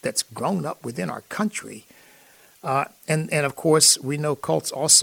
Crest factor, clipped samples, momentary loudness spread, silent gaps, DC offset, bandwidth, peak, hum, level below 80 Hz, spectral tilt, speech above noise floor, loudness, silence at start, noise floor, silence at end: 22 dB; under 0.1%; 15 LU; none; under 0.1%; 18.5 kHz; -2 dBFS; none; -68 dBFS; -2.5 dB/octave; 30 dB; -22 LUFS; 0.05 s; -53 dBFS; 0 s